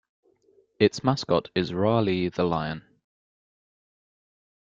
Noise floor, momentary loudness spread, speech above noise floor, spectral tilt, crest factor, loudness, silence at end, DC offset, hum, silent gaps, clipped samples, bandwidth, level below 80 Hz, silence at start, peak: -63 dBFS; 6 LU; 39 dB; -6.5 dB/octave; 22 dB; -25 LUFS; 1.95 s; under 0.1%; none; none; under 0.1%; 7.6 kHz; -60 dBFS; 0.8 s; -6 dBFS